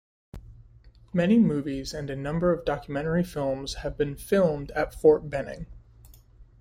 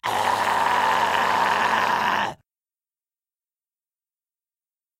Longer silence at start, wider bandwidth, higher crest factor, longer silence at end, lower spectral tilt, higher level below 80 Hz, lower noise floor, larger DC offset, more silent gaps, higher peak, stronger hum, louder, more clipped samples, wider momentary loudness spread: first, 0.35 s vs 0.05 s; about the same, 16 kHz vs 16 kHz; about the same, 20 dB vs 20 dB; second, 0.15 s vs 2.65 s; first, -7 dB/octave vs -2.5 dB/octave; first, -46 dBFS vs -64 dBFS; second, -53 dBFS vs under -90 dBFS; neither; neither; about the same, -8 dBFS vs -6 dBFS; neither; second, -26 LUFS vs -21 LUFS; neither; first, 12 LU vs 3 LU